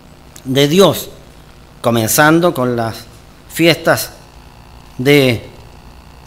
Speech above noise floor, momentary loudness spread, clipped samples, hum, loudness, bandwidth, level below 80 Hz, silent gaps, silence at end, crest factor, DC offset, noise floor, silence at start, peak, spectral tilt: 27 dB; 17 LU; 0.4%; none; -13 LUFS; 18 kHz; -42 dBFS; none; 0.65 s; 16 dB; under 0.1%; -39 dBFS; 0.45 s; 0 dBFS; -4.5 dB/octave